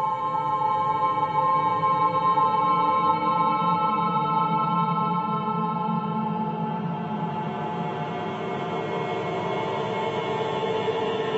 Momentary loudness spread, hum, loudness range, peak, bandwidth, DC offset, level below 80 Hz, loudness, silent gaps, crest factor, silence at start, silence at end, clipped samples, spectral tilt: 8 LU; none; 7 LU; -10 dBFS; 8 kHz; under 0.1%; -66 dBFS; -25 LUFS; none; 16 dB; 0 s; 0 s; under 0.1%; -7.5 dB/octave